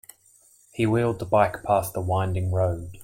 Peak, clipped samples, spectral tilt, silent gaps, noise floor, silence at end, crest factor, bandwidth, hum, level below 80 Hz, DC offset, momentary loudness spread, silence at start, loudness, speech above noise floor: -6 dBFS; under 0.1%; -7 dB/octave; none; -58 dBFS; 0 s; 18 dB; 16.5 kHz; none; -52 dBFS; under 0.1%; 5 LU; 0.75 s; -24 LUFS; 34 dB